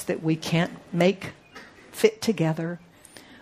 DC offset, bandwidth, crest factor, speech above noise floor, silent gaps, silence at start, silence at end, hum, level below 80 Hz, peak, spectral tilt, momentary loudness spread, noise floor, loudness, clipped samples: under 0.1%; 15.5 kHz; 22 dB; 25 dB; none; 0 s; 0.05 s; none; -64 dBFS; -4 dBFS; -6 dB/octave; 22 LU; -49 dBFS; -25 LUFS; under 0.1%